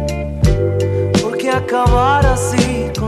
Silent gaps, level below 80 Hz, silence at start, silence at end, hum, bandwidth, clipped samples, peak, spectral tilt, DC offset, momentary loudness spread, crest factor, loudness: none; -22 dBFS; 0 s; 0 s; none; 14 kHz; under 0.1%; -2 dBFS; -6 dB/octave; under 0.1%; 5 LU; 14 dB; -15 LUFS